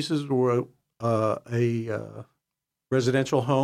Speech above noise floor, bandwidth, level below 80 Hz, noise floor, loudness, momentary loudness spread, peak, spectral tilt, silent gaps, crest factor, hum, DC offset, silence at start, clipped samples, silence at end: 61 dB; 13 kHz; -68 dBFS; -86 dBFS; -26 LUFS; 12 LU; -10 dBFS; -6.5 dB/octave; none; 16 dB; none; under 0.1%; 0 s; under 0.1%; 0 s